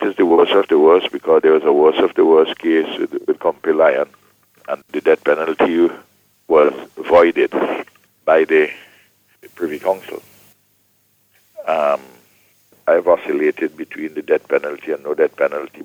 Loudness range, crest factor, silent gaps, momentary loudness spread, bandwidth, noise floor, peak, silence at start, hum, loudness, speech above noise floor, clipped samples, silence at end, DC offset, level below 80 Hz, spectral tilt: 10 LU; 16 dB; none; 14 LU; 16 kHz; -60 dBFS; 0 dBFS; 0 s; none; -16 LUFS; 44 dB; under 0.1%; 0 s; under 0.1%; -62 dBFS; -5.5 dB/octave